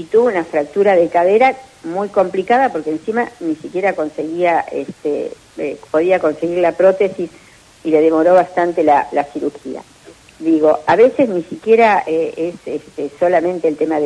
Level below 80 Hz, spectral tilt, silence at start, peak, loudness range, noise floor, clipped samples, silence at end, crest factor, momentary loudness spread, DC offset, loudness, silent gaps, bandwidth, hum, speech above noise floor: -58 dBFS; -6.5 dB/octave; 0 s; -2 dBFS; 4 LU; -39 dBFS; under 0.1%; 0 s; 14 dB; 13 LU; under 0.1%; -15 LUFS; none; 11 kHz; none; 24 dB